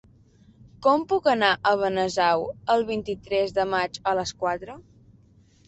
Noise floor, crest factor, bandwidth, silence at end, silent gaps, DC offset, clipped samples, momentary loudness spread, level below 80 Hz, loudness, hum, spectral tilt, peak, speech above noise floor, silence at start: -57 dBFS; 20 dB; 8.4 kHz; 0.85 s; none; under 0.1%; under 0.1%; 8 LU; -56 dBFS; -24 LUFS; none; -4 dB/octave; -6 dBFS; 33 dB; 0.8 s